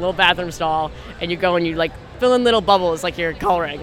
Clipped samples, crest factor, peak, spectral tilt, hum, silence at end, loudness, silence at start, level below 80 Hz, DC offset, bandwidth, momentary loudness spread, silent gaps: under 0.1%; 18 dB; 0 dBFS; -4.5 dB/octave; none; 0 s; -19 LUFS; 0 s; -40 dBFS; under 0.1%; 15.5 kHz; 9 LU; none